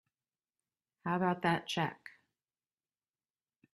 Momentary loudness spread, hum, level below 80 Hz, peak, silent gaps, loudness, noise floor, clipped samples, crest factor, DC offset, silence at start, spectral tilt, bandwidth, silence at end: 19 LU; none; -76 dBFS; -16 dBFS; none; -35 LUFS; under -90 dBFS; under 0.1%; 24 dB; under 0.1%; 1.05 s; -5.5 dB/octave; 12.5 kHz; 1.65 s